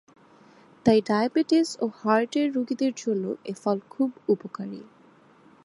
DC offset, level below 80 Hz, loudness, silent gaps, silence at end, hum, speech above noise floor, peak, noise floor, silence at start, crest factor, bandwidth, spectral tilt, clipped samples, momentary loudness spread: under 0.1%; -66 dBFS; -25 LUFS; none; 0.8 s; none; 31 dB; -6 dBFS; -56 dBFS; 0.85 s; 20 dB; 11.5 kHz; -5.5 dB/octave; under 0.1%; 10 LU